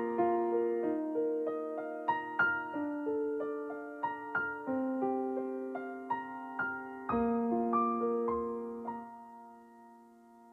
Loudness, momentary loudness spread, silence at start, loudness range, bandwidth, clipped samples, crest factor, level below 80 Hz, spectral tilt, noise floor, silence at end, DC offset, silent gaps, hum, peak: -35 LUFS; 10 LU; 0 s; 3 LU; 4.6 kHz; under 0.1%; 16 dB; -68 dBFS; -8 dB/octave; -58 dBFS; 0 s; under 0.1%; none; none; -18 dBFS